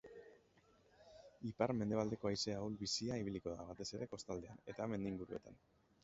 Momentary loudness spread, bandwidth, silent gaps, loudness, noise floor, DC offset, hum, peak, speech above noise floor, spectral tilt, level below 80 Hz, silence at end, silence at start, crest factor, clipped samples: 20 LU; 7.6 kHz; none; -44 LUFS; -72 dBFS; under 0.1%; none; -22 dBFS; 29 dB; -5 dB/octave; -68 dBFS; 0.45 s; 0.05 s; 22 dB; under 0.1%